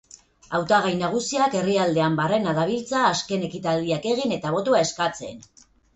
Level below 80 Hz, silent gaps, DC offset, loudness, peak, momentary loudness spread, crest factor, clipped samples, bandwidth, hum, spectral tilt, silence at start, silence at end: -58 dBFS; none; under 0.1%; -23 LUFS; -6 dBFS; 6 LU; 16 dB; under 0.1%; 8.4 kHz; none; -4.5 dB/octave; 0.5 s; 0.55 s